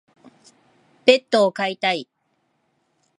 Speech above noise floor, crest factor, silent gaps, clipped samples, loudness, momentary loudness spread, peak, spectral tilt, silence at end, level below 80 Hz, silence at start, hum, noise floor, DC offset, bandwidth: 50 dB; 22 dB; none; under 0.1%; -19 LUFS; 7 LU; 0 dBFS; -4 dB/octave; 1.15 s; -76 dBFS; 1.05 s; none; -69 dBFS; under 0.1%; 11.5 kHz